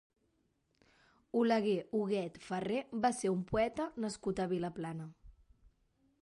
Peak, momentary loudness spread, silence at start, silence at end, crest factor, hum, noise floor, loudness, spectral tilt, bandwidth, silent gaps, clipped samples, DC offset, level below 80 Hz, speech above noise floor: -20 dBFS; 9 LU; 1.35 s; 0.9 s; 16 dB; none; -78 dBFS; -36 LUFS; -6 dB/octave; 11.5 kHz; none; under 0.1%; under 0.1%; -64 dBFS; 43 dB